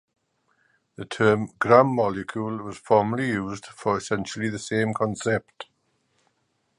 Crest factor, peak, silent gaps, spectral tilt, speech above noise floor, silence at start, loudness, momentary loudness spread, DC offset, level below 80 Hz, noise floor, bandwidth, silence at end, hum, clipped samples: 24 dB; -2 dBFS; none; -6 dB/octave; 48 dB; 1 s; -24 LUFS; 16 LU; under 0.1%; -60 dBFS; -72 dBFS; 11 kHz; 1.15 s; none; under 0.1%